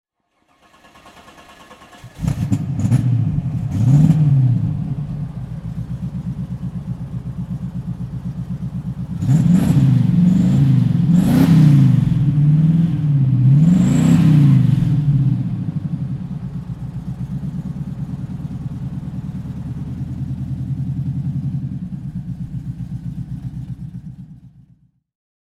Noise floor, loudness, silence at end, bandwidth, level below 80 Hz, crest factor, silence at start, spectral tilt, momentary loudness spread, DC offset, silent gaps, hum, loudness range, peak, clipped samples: -63 dBFS; -18 LUFS; 1 s; 12.5 kHz; -38 dBFS; 16 dB; 1.05 s; -9 dB/octave; 16 LU; under 0.1%; none; none; 14 LU; -2 dBFS; under 0.1%